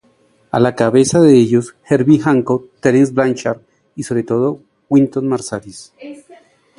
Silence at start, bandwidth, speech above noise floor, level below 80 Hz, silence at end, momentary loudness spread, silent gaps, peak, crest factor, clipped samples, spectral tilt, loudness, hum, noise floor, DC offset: 0.55 s; 11.5 kHz; 41 dB; -54 dBFS; 0.65 s; 22 LU; none; 0 dBFS; 14 dB; under 0.1%; -6.5 dB/octave; -14 LUFS; none; -55 dBFS; under 0.1%